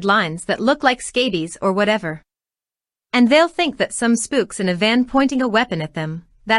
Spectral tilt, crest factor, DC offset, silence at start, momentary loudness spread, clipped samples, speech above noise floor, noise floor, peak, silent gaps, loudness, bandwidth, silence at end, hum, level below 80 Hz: -4 dB/octave; 18 dB; under 0.1%; 0 s; 11 LU; under 0.1%; over 72 dB; under -90 dBFS; 0 dBFS; none; -18 LUFS; 11.5 kHz; 0 s; none; -52 dBFS